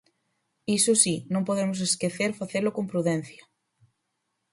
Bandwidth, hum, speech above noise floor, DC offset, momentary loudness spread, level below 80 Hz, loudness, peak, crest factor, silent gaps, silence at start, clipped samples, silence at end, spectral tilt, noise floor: 12 kHz; none; 53 dB; under 0.1%; 9 LU; -68 dBFS; -25 LUFS; -6 dBFS; 22 dB; none; 0.7 s; under 0.1%; 1.2 s; -3.5 dB/octave; -79 dBFS